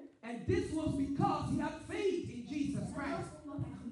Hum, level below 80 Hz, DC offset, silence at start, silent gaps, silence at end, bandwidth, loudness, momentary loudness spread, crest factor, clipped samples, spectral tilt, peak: none; -56 dBFS; under 0.1%; 0 s; none; 0 s; 11.5 kHz; -37 LUFS; 9 LU; 18 dB; under 0.1%; -7 dB/octave; -20 dBFS